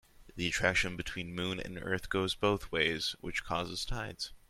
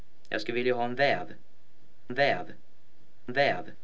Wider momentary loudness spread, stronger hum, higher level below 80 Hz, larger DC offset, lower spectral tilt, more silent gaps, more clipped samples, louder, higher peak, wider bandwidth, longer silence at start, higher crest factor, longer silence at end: second, 9 LU vs 14 LU; neither; first, -50 dBFS vs -70 dBFS; second, under 0.1% vs 2%; second, -3.5 dB/octave vs -5.5 dB/octave; neither; neither; second, -34 LUFS vs -29 LUFS; about the same, -12 dBFS vs -12 dBFS; first, 16 kHz vs 8 kHz; about the same, 0.2 s vs 0.3 s; about the same, 22 dB vs 18 dB; about the same, 0.1 s vs 0.1 s